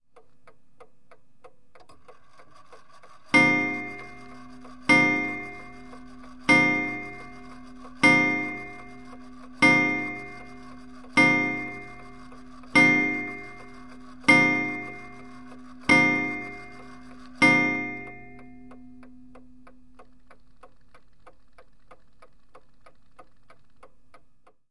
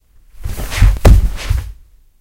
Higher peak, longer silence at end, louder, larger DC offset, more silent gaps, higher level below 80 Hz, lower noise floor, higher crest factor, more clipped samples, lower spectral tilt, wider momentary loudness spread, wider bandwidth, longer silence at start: second, -6 dBFS vs 0 dBFS; first, 6.45 s vs 0.45 s; second, -21 LUFS vs -14 LUFS; first, 0.5% vs under 0.1%; neither; second, -58 dBFS vs -14 dBFS; first, -61 dBFS vs -39 dBFS; first, 22 dB vs 14 dB; second, under 0.1% vs 0.2%; second, -4.5 dB/octave vs -6 dB/octave; first, 27 LU vs 19 LU; second, 11.5 kHz vs 16.5 kHz; first, 3.35 s vs 0.4 s